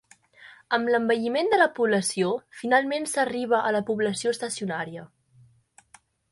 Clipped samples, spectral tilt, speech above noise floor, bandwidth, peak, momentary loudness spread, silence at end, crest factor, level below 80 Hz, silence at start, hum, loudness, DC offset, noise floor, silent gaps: under 0.1%; -4 dB/octave; 34 dB; 11.5 kHz; -6 dBFS; 9 LU; 1.25 s; 20 dB; -70 dBFS; 0.4 s; none; -25 LUFS; under 0.1%; -59 dBFS; none